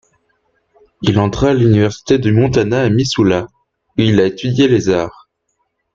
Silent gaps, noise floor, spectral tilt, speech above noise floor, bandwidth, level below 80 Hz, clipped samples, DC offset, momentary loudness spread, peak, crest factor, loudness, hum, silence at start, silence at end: none; -68 dBFS; -6.5 dB/octave; 55 dB; 7.6 kHz; -40 dBFS; under 0.1%; under 0.1%; 7 LU; 0 dBFS; 14 dB; -14 LUFS; none; 1 s; 0.85 s